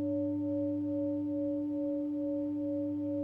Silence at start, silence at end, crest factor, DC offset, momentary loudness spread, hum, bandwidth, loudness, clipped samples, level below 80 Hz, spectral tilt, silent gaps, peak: 0 s; 0 s; 8 dB; under 0.1%; 1 LU; none; 2.4 kHz; -34 LUFS; under 0.1%; -72 dBFS; -11.5 dB/octave; none; -26 dBFS